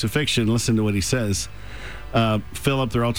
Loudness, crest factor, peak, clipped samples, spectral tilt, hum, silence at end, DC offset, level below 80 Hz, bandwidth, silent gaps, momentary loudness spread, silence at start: -22 LUFS; 14 dB; -8 dBFS; under 0.1%; -5 dB/octave; none; 0 s; 1%; -40 dBFS; over 20 kHz; none; 13 LU; 0 s